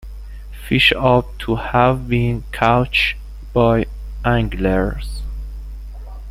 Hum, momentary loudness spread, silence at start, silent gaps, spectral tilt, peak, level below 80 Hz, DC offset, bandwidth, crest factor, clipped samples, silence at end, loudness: 50 Hz at -30 dBFS; 21 LU; 0 s; none; -6.5 dB/octave; -2 dBFS; -28 dBFS; under 0.1%; 15.5 kHz; 18 dB; under 0.1%; 0 s; -17 LUFS